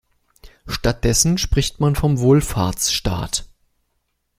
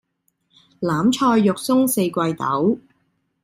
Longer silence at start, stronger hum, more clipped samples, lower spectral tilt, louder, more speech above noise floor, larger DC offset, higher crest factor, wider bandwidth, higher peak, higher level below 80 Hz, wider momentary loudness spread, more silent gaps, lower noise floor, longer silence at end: second, 0.45 s vs 0.8 s; neither; neither; about the same, -4.5 dB/octave vs -5.5 dB/octave; about the same, -19 LUFS vs -19 LUFS; about the same, 53 dB vs 51 dB; neither; about the same, 18 dB vs 14 dB; about the same, 16 kHz vs 16 kHz; first, 0 dBFS vs -6 dBFS; first, -30 dBFS vs -60 dBFS; about the same, 8 LU vs 7 LU; neither; about the same, -71 dBFS vs -69 dBFS; first, 0.9 s vs 0.65 s